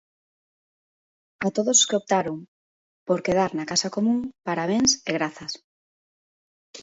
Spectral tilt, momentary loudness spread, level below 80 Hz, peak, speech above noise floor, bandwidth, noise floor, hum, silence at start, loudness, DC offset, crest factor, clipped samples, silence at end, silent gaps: -3 dB/octave; 16 LU; -62 dBFS; -4 dBFS; over 66 dB; 8 kHz; under -90 dBFS; none; 1.4 s; -23 LUFS; under 0.1%; 22 dB; under 0.1%; 0 s; 2.48-3.06 s, 5.64-6.74 s